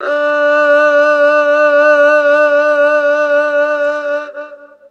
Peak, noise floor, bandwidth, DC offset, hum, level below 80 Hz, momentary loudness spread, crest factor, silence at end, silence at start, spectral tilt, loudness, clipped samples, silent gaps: 0 dBFS; -32 dBFS; 7.2 kHz; under 0.1%; none; -74 dBFS; 9 LU; 12 dB; 0.25 s; 0 s; -1.5 dB/octave; -11 LUFS; under 0.1%; none